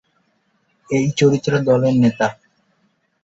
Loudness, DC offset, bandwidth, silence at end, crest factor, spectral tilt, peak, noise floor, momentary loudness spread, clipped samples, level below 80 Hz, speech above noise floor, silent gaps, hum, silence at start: -17 LUFS; under 0.1%; 8 kHz; 0.9 s; 16 dB; -6.5 dB/octave; -2 dBFS; -64 dBFS; 7 LU; under 0.1%; -56 dBFS; 49 dB; none; none; 0.9 s